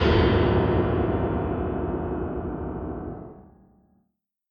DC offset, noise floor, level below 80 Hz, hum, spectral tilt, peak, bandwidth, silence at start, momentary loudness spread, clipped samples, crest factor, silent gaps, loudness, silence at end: under 0.1%; -74 dBFS; -34 dBFS; none; -9 dB/octave; -8 dBFS; 6.6 kHz; 0 s; 15 LU; under 0.1%; 18 dB; none; -25 LUFS; 1.1 s